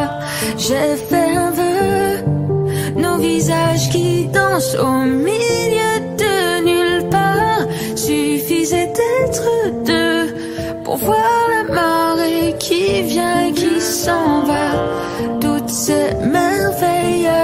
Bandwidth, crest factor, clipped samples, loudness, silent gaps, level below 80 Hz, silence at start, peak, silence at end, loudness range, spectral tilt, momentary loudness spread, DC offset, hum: 16 kHz; 14 dB; under 0.1%; -16 LUFS; none; -42 dBFS; 0 s; -2 dBFS; 0 s; 1 LU; -4.5 dB/octave; 4 LU; under 0.1%; none